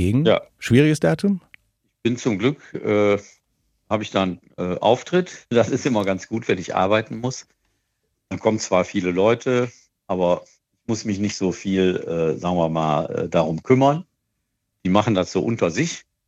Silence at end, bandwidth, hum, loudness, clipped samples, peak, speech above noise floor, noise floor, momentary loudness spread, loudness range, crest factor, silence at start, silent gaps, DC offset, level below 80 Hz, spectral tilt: 0.25 s; 12.5 kHz; none; -21 LUFS; under 0.1%; -2 dBFS; 55 dB; -75 dBFS; 10 LU; 2 LU; 20 dB; 0 s; none; under 0.1%; -58 dBFS; -6 dB/octave